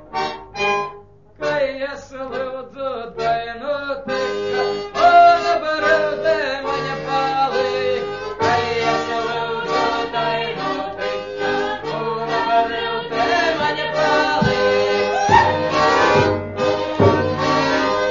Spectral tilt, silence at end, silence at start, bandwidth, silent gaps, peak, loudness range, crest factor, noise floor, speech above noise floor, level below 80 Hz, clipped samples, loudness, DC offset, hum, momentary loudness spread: -5 dB/octave; 0 s; 0 s; 7.4 kHz; none; 0 dBFS; 7 LU; 18 dB; -43 dBFS; 15 dB; -48 dBFS; under 0.1%; -19 LUFS; 0.2%; none; 11 LU